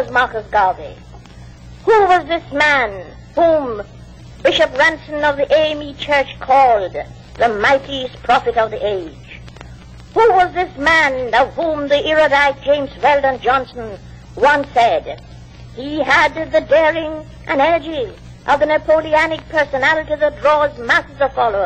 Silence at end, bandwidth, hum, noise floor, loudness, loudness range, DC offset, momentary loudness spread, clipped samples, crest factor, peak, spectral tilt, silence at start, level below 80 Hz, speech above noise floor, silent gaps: 0 s; 9 kHz; none; -37 dBFS; -15 LUFS; 2 LU; under 0.1%; 16 LU; under 0.1%; 12 dB; -4 dBFS; -4.5 dB/octave; 0 s; -40 dBFS; 22 dB; none